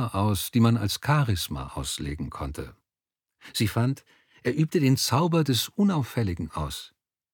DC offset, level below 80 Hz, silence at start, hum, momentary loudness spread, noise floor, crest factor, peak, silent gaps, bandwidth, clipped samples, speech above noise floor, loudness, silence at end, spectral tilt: under 0.1%; -46 dBFS; 0 s; none; 12 LU; -90 dBFS; 18 dB; -8 dBFS; none; 19 kHz; under 0.1%; 64 dB; -26 LUFS; 0.45 s; -5.5 dB/octave